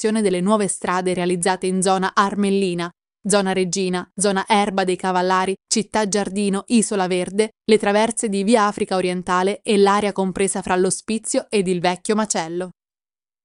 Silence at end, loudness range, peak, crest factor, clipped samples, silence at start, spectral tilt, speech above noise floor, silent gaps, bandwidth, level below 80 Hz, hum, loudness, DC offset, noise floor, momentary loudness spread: 0.75 s; 2 LU; -2 dBFS; 16 dB; under 0.1%; 0 s; -4 dB/octave; over 71 dB; none; 11.5 kHz; -56 dBFS; none; -20 LUFS; under 0.1%; under -90 dBFS; 5 LU